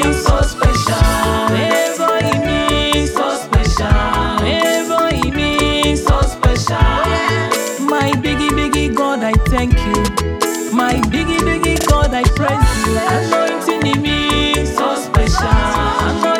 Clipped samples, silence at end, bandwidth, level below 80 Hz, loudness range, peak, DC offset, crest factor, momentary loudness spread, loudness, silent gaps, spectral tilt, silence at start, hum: under 0.1%; 0 s; 19 kHz; -20 dBFS; 1 LU; 0 dBFS; under 0.1%; 14 dB; 2 LU; -15 LUFS; none; -5 dB/octave; 0 s; none